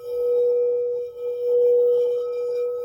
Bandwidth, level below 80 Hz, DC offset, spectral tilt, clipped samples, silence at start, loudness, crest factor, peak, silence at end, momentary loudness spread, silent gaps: 5.8 kHz; -68 dBFS; under 0.1%; -5.5 dB/octave; under 0.1%; 0 s; -22 LUFS; 8 dB; -12 dBFS; 0 s; 9 LU; none